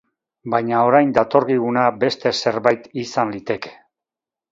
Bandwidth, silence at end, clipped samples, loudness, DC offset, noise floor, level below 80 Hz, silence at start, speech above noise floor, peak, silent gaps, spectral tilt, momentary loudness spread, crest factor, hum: 7.8 kHz; 0.8 s; under 0.1%; -19 LUFS; under 0.1%; -89 dBFS; -60 dBFS; 0.45 s; 71 dB; 0 dBFS; none; -5.5 dB/octave; 11 LU; 20 dB; none